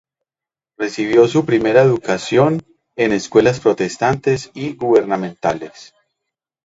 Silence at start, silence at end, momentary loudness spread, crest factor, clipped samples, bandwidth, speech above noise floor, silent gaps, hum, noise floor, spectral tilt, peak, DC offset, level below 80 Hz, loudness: 0.8 s; 0.8 s; 12 LU; 16 dB; under 0.1%; 8 kHz; 74 dB; none; none; -90 dBFS; -6 dB/octave; 0 dBFS; under 0.1%; -52 dBFS; -16 LUFS